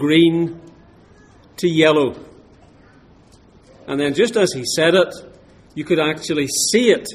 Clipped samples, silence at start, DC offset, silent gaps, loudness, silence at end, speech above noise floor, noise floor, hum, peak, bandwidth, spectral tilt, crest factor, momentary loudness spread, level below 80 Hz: under 0.1%; 0 s; under 0.1%; none; -17 LUFS; 0 s; 32 dB; -49 dBFS; none; 0 dBFS; 15.5 kHz; -4 dB/octave; 18 dB; 15 LU; -56 dBFS